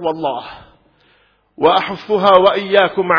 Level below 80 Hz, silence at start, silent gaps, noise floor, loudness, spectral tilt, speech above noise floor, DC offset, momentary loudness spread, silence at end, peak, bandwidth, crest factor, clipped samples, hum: -52 dBFS; 0 s; none; -56 dBFS; -14 LUFS; -6.5 dB/octave; 42 dB; under 0.1%; 13 LU; 0 s; 0 dBFS; 5.4 kHz; 16 dB; under 0.1%; none